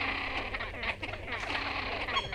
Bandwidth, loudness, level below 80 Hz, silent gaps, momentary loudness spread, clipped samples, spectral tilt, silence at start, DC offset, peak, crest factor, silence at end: 15.5 kHz; -34 LUFS; -48 dBFS; none; 5 LU; under 0.1%; -4 dB/octave; 0 s; under 0.1%; -18 dBFS; 16 dB; 0 s